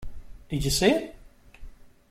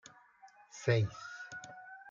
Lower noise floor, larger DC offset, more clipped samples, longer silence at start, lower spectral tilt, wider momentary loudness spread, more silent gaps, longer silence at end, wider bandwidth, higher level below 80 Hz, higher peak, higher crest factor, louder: second, -45 dBFS vs -61 dBFS; neither; neither; second, 0 s vs 0.45 s; second, -4 dB/octave vs -6 dB/octave; about the same, 21 LU vs 20 LU; neither; first, 0.25 s vs 0 s; first, 16 kHz vs 7.6 kHz; first, -42 dBFS vs -72 dBFS; first, -6 dBFS vs -18 dBFS; about the same, 22 dB vs 22 dB; first, -25 LUFS vs -36 LUFS